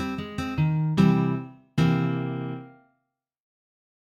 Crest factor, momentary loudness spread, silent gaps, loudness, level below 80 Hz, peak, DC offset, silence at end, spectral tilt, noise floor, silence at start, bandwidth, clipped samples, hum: 18 dB; 12 LU; none; -25 LUFS; -52 dBFS; -8 dBFS; under 0.1%; 1.45 s; -8 dB/octave; -79 dBFS; 0 s; 8 kHz; under 0.1%; none